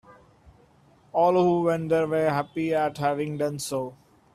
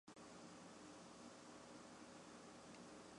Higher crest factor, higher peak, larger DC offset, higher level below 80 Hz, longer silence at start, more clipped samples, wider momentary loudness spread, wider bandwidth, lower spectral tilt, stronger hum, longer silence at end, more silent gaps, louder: about the same, 16 dB vs 16 dB; first, -10 dBFS vs -44 dBFS; neither; first, -64 dBFS vs -86 dBFS; about the same, 0.1 s vs 0.05 s; neither; first, 10 LU vs 1 LU; first, 14.5 kHz vs 11 kHz; first, -6 dB/octave vs -3.5 dB/octave; neither; first, 0.4 s vs 0 s; neither; first, -25 LUFS vs -60 LUFS